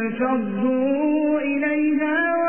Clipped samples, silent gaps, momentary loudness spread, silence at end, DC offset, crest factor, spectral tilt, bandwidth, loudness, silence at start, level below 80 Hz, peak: under 0.1%; none; 2 LU; 0 s; 0.5%; 12 dB; -10.5 dB/octave; 3.5 kHz; -21 LUFS; 0 s; -66 dBFS; -10 dBFS